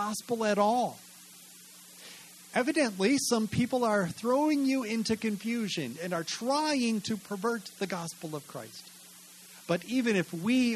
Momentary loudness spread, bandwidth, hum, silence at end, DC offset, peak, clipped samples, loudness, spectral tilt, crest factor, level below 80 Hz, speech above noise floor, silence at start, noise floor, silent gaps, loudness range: 22 LU; 13 kHz; none; 0 s; under 0.1%; -12 dBFS; under 0.1%; -30 LUFS; -4.5 dB/octave; 18 dB; -70 dBFS; 23 dB; 0 s; -52 dBFS; none; 6 LU